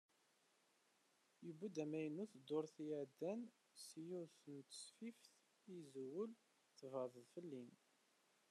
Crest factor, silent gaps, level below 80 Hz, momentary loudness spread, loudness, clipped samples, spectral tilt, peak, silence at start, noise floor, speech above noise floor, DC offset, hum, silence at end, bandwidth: 18 dB; none; under -90 dBFS; 12 LU; -52 LUFS; under 0.1%; -5.5 dB/octave; -34 dBFS; 1.4 s; -81 dBFS; 29 dB; under 0.1%; none; 0.75 s; 12.5 kHz